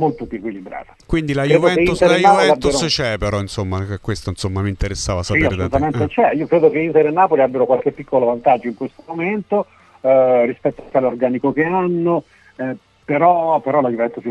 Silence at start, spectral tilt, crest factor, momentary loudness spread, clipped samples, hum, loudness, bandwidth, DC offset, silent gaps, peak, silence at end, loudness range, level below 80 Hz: 0 s; -5.5 dB/octave; 16 dB; 14 LU; under 0.1%; none; -17 LUFS; 12 kHz; under 0.1%; none; 0 dBFS; 0 s; 3 LU; -38 dBFS